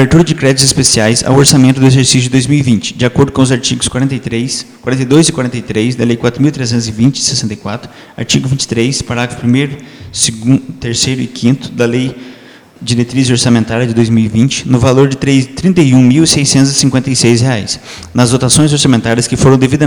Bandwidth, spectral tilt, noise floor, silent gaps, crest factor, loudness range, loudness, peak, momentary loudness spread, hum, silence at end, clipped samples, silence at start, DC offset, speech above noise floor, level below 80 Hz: over 20 kHz; -4.5 dB/octave; -36 dBFS; none; 10 dB; 5 LU; -10 LUFS; 0 dBFS; 10 LU; none; 0 s; 1%; 0 s; under 0.1%; 26 dB; -36 dBFS